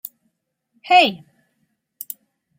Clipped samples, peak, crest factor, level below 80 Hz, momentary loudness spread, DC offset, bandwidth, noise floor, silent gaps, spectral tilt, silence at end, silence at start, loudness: under 0.1%; -2 dBFS; 20 dB; -74 dBFS; 23 LU; under 0.1%; 16.5 kHz; -72 dBFS; none; -3 dB/octave; 1.45 s; 0.85 s; -15 LUFS